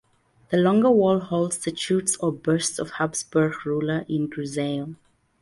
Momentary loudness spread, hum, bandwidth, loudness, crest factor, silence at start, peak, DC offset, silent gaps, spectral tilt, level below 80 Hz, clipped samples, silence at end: 9 LU; none; 11.5 kHz; -23 LUFS; 16 dB; 0.5 s; -8 dBFS; under 0.1%; none; -5 dB/octave; -62 dBFS; under 0.1%; 0.45 s